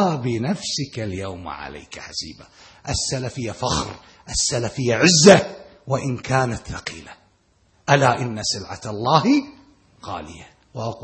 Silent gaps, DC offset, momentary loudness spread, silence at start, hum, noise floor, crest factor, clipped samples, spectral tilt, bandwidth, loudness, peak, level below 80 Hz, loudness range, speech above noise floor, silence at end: none; under 0.1%; 20 LU; 0 s; none; -61 dBFS; 22 dB; under 0.1%; -4 dB/octave; 8.8 kHz; -20 LUFS; 0 dBFS; -46 dBFS; 9 LU; 40 dB; 0 s